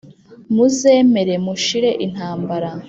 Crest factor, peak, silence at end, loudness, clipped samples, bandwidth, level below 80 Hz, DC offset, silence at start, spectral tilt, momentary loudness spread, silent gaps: 14 dB; -2 dBFS; 0 s; -16 LUFS; under 0.1%; 8 kHz; -58 dBFS; under 0.1%; 0.05 s; -5 dB/octave; 11 LU; none